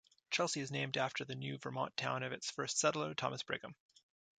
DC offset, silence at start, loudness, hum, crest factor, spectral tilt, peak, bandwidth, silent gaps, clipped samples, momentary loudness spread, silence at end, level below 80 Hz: under 0.1%; 0.3 s; -39 LUFS; none; 22 dB; -3 dB/octave; -20 dBFS; 9.4 kHz; none; under 0.1%; 9 LU; 0.65 s; -80 dBFS